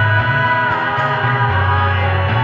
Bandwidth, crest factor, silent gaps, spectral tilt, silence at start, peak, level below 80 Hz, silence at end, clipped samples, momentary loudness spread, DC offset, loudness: 5.8 kHz; 12 dB; none; -7.5 dB/octave; 0 s; -4 dBFS; -40 dBFS; 0 s; under 0.1%; 2 LU; under 0.1%; -15 LUFS